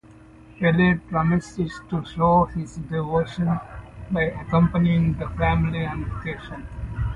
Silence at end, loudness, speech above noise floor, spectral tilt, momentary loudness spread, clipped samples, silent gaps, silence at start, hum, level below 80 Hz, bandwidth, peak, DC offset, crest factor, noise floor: 0 s; -23 LUFS; 25 dB; -8 dB/octave; 13 LU; under 0.1%; none; 0.5 s; none; -36 dBFS; 8 kHz; -6 dBFS; under 0.1%; 18 dB; -47 dBFS